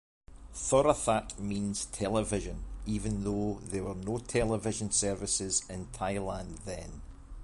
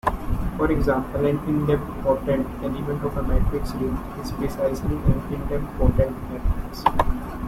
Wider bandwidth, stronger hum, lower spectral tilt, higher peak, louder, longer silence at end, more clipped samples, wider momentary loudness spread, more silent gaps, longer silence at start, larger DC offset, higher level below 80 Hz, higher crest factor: second, 11.5 kHz vs 16.5 kHz; neither; second, -4.5 dB/octave vs -8 dB/octave; second, -10 dBFS vs -2 dBFS; second, -32 LUFS vs -25 LUFS; about the same, 0 s vs 0 s; neither; first, 14 LU vs 6 LU; neither; first, 0.3 s vs 0.05 s; neither; second, -46 dBFS vs -28 dBFS; about the same, 22 dB vs 20 dB